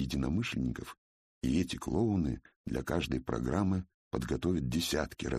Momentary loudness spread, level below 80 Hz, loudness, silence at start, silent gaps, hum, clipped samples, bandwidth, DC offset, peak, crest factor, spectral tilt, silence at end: 8 LU; -46 dBFS; -34 LUFS; 0 s; 0.98-1.41 s, 2.56-2.64 s, 3.94-4.11 s; none; under 0.1%; 15 kHz; under 0.1%; -16 dBFS; 18 dB; -6 dB/octave; 0 s